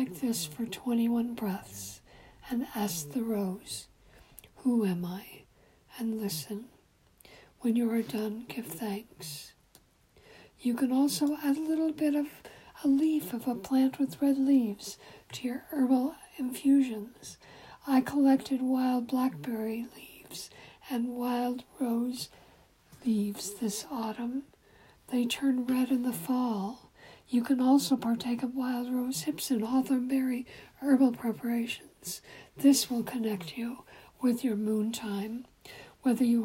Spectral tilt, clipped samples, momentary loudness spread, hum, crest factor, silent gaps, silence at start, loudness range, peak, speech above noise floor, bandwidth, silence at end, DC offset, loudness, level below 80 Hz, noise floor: -4.5 dB/octave; under 0.1%; 17 LU; none; 18 dB; none; 0 s; 6 LU; -12 dBFS; 33 dB; 16 kHz; 0 s; under 0.1%; -31 LUFS; -68 dBFS; -63 dBFS